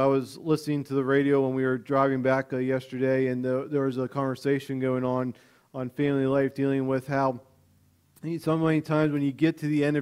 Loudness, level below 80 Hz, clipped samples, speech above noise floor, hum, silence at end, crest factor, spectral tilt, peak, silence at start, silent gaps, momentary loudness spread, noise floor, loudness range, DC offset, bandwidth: -26 LUFS; -64 dBFS; under 0.1%; 37 dB; none; 0 s; 16 dB; -8 dB/octave; -10 dBFS; 0 s; none; 5 LU; -63 dBFS; 3 LU; under 0.1%; 14.5 kHz